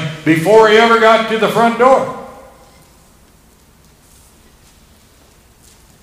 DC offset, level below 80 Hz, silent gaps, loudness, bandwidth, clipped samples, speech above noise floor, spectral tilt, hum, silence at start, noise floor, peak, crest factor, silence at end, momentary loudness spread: under 0.1%; -50 dBFS; none; -10 LUFS; 16 kHz; 0.4%; 37 dB; -5 dB/octave; none; 0 s; -47 dBFS; 0 dBFS; 14 dB; 3.7 s; 7 LU